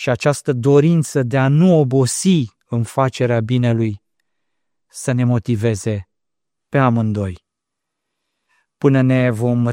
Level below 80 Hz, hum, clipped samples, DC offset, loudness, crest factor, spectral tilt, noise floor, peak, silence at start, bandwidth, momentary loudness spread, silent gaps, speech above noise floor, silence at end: -54 dBFS; none; under 0.1%; under 0.1%; -17 LUFS; 16 dB; -6.5 dB/octave; -83 dBFS; -2 dBFS; 0 s; 16 kHz; 10 LU; none; 68 dB; 0 s